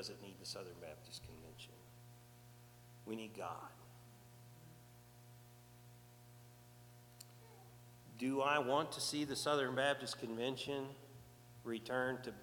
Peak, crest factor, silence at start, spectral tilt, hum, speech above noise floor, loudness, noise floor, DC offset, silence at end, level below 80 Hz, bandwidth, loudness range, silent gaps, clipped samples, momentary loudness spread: -22 dBFS; 24 dB; 0 s; -4 dB/octave; 60 Hz at -65 dBFS; 21 dB; -41 LUFS; -62 dBFS; under 0.1%; 0 s; -74 dBFS; 19 kHz; 22 LU; none; under 0.1%; 24 LU